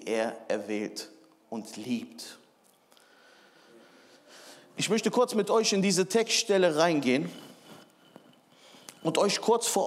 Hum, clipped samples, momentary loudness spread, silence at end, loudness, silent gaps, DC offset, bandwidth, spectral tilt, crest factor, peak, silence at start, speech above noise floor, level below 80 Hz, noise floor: none; under 0.1%; 21 LU; 0 s; -27 LUFS; none; under 0.1%; 16 kHz; -3.5 dB/octave; 20 dB; -10 dBFS; 0 s; 36 dB; -88 dBFS; -63 dBFS